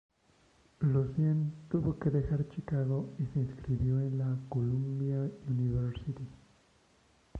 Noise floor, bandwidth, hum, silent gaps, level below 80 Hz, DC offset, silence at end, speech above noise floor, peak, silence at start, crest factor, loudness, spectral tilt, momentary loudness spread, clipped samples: -67 dBFS; 5.2 kHz; none; none; -52 dBFS; under 0.1%; 0 s; 35 dB; -18 dBFS; 0.8 s; 14 dB; -33 LUFS; -10.5 dB/octave; 5 LU; under 0.1%